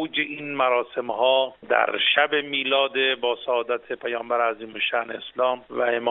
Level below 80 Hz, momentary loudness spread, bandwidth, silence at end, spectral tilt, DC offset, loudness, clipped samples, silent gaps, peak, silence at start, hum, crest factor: -72 dBFS; 8 LU; 4.1 kHz; 0 s; 1 dB/octave; under 0.1%; -23 LUFS; under 0.1%; none; -4 dBFS; 0 s; none; 20 dB